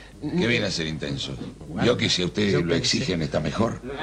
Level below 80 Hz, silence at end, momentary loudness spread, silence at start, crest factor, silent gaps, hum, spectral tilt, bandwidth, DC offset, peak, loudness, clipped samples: -46 dBFS; 0 s; 8 LU; 0 s; 18 dB; none; none; -4.5 dB/octave; 10.5 kHz; under 0.1%; -8 dBFS; -24 LUFS; under 0.1%